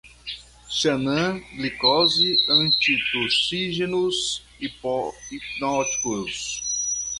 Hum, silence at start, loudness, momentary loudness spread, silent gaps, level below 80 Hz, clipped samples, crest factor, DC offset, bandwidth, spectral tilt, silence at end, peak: none; 0.05 s; -21 LUFS; 15 LU; none; -54 dBFS; under 0.1%; 18 dB; under 0.1%; 11.5 kHz; -2 dB/octave; 0 s; -6 dBFS